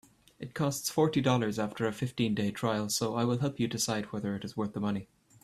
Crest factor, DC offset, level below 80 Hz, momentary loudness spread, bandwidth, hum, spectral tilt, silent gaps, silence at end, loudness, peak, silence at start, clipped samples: 18 dB; under 0.1%; -64 dBFS; 8 LU; 15.5 kHz; none; -5 dB/octave; none; 0.4 s; -31 LUFS; -12 dBFS; 0.4 s; under 0.1%